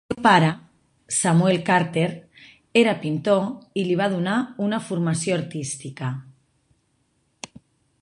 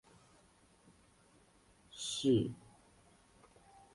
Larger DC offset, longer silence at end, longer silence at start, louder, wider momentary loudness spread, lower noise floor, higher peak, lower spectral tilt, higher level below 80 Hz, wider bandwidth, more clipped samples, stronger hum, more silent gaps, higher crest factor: neither; first, 1.7 s vs 1.4 s; second, 0.1 s vs 1.95 s; first, -22 LUFS vs -35 LUFS; second, 18 LU vs 24 LU; about the same, -68 dBFS vs -67 dBFS; first, -2 dBFS vs -20 dBFS; about the same, -5 dB/octave vs -5.5 dB/octave; first, -62 dBFS vs -70 dBFS; about the same, 11.5 kHz vs 11.5 kHz; neither; neither; neither; about the same, 22 dB vs 20 dB